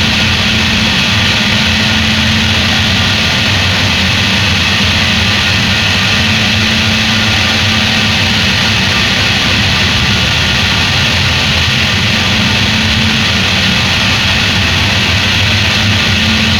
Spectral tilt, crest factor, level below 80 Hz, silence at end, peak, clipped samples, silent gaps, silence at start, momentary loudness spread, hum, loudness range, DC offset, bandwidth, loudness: -3.5 dB/octave; 10 dB; -26 dBFS; 0 s; 0 dBFS; under 0.1%; none; 0 s; 0 LU; none; 0 LU; under 0.1%; 18 kHz; -9 LUFS